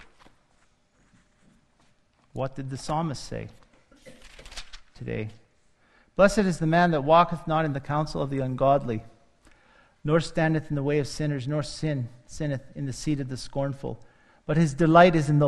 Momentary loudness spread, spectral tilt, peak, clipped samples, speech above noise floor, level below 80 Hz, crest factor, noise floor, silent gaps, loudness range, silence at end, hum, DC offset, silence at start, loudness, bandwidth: 18 LU; -6.5 dB/octave; -2 dBFS; under 0.1%; 40 dB; -48 dBFS; 24 dB; -64 dBFS; none; 12 LU; 0 s; none; under 0.1%; 2.35 s; -25 LUFS; 12 kHz